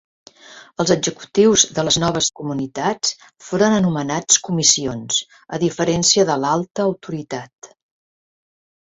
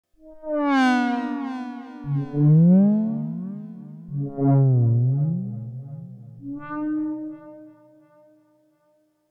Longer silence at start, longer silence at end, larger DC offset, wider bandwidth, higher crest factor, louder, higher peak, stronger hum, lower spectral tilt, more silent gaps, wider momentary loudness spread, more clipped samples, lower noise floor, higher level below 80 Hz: first, 0.5 s vs 0.25 s; second, 1.2 s vs 1.6 s; neither; about the same, 8.2 kHz vs 7.8 kHz; first, 20 dB vs 14 dB; first, -18 LUFS vs -22 LUFS; first, 0 dBFS vs -8 dBFS; neither; second, -3 dB/octave vs -9 dB/octave; neither; second, 13 LU vs 21 LU; neither; second, -44 dBFS vs -65 dBFS; first, -54 dBFS vs -62 dBFS